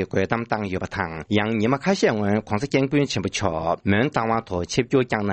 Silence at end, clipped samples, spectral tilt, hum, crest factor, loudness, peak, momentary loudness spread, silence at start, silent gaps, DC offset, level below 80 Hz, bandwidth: 0 s; under 0.1%; -5.5 dB/octave; none; 18 dB; -23 LUFS; -4 dBFS; 5 LU; 0 s; none; under 0.1%; -50 dBFS; 8.8 kHz